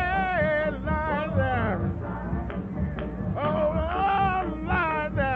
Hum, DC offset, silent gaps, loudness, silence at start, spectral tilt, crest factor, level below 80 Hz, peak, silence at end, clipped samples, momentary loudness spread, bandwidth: none; under 0.1%; none; -27 LUFS; 0 s; -9.5 dB/octave; 14 dB; -36 dBFS; -12 dBFS; 0 s; under 0.1%; 7 LU; 5.2 kHz